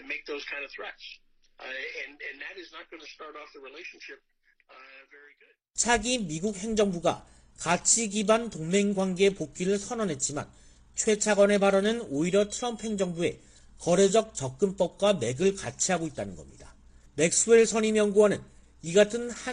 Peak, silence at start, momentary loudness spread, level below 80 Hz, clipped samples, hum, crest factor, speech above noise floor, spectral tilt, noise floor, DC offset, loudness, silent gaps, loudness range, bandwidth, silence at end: -8 dBFS; 0 s; 20 LU; -56 dBFS; under 0.1%; none; 20 dB; 33 dB; -3.5 dB/octave; -60 dBFS; under 0.1%; -26 LUFS; none; 15 LU; 10 kHz; 0 s